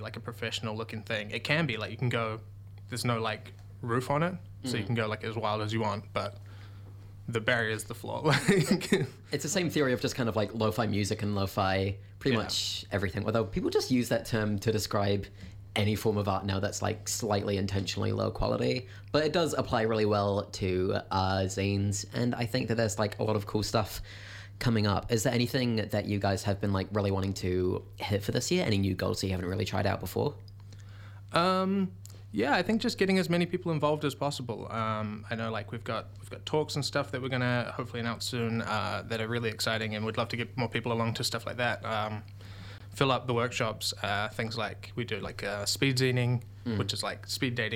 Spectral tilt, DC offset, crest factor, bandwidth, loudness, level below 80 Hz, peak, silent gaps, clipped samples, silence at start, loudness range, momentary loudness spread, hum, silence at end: -5 dB/octave; under 0.1%; 22 dB; 17 kHz; -31 LUFS; -54 dBFS; -8 dBFS; none; under 0.1%; 0 s; 4 LU; 9 LU; none; 0 s